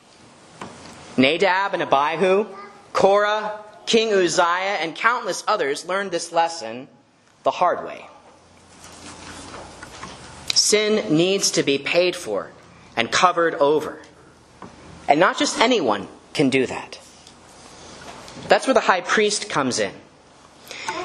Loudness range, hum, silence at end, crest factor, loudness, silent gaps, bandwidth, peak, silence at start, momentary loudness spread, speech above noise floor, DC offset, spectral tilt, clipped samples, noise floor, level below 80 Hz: 6 LU; none; 0 s; 22 dB; -20 LUFS; none; 13 kHz; 0 dBFS; 0.6 s; 21 LU; 35 dB; under 0.1%; -3 dB/octave; under 0.1%; -55 dBFS; -60 dBFS